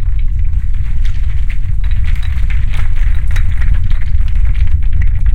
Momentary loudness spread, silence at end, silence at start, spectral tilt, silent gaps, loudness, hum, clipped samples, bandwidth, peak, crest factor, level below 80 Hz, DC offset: 3 LU; 0 s; 0 s; -6.5 dB/octave; none; -17 LUFS; none; under 0.1%; 4.1 kHz; 0 dBFS; 10 dB; -10 dBFS; 20%